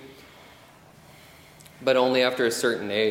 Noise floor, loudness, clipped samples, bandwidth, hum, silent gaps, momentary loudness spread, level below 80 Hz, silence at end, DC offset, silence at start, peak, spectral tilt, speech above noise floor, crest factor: -51 dBFS; -23 LUFS; under 0.1%; 16.5 kHz; none; none; 5 LU; -66 dBFS; 0 s; under 0.1%; 0 s; -8 dBFS; -3.5 dB/octave; 29 dB; 18 dB